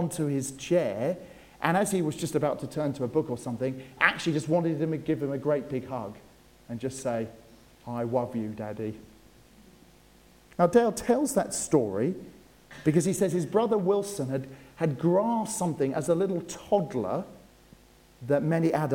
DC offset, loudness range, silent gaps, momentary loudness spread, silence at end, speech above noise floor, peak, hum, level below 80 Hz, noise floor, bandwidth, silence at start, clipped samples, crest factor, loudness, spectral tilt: under 0.1%; 7 LU; none; 11 LU; 0 s; 29 dB; -4 dBFS; none; -60 dBFS; -57 dBFS; 17 kHz; 0 s; under 0.1%; 24 dB; -28 LUFS; -5.5 dB/octave